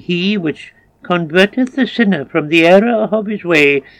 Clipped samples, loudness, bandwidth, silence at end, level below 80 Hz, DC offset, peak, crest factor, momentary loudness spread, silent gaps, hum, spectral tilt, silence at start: 0.4%; -13 LUFS; 14 kHz; 0.2 s; -56 dBFS; under 0.1%; 0 dBFS; 14 dB; 10 LU; none; none; -6 dB/octave; 0.1 s